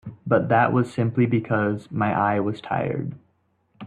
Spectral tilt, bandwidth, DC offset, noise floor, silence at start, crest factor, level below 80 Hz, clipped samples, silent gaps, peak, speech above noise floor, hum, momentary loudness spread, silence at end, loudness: -9 dB/octave; 9.6 kHz; under 0.1%; -67 dBFS; 0.05 s; 16 dB; -60 dBFS; under 0.1%; none; -6 dBFS; 45 dB; none; 7 LU; 0 s; -23 LUFS